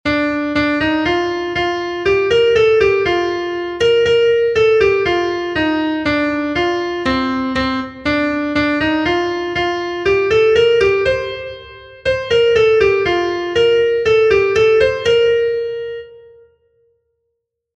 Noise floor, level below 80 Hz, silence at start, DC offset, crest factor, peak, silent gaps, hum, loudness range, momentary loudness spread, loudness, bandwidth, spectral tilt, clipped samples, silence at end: -74 dBFS; -40 dBFS; 0.05 s; under 0.1%; 14 dB; -2 dBFS; none; none; 4 LU; 8 LU; -15 LUFS; 8 kHz; -5 dB/octave; under 0.1%; 1.55 s